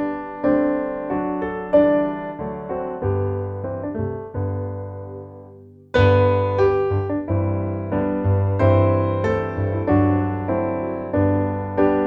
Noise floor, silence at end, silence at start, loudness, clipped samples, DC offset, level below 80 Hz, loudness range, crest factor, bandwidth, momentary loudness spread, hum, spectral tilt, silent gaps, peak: -44 dBFS; 0 s; 0 s; -21 LUFS; under 0.1%; under 0.1%; -44 dBFS; 7 LU; 18 dB; 4.9 kHz; 11 LU; none; -10 dB/octave; none; -2 dBFS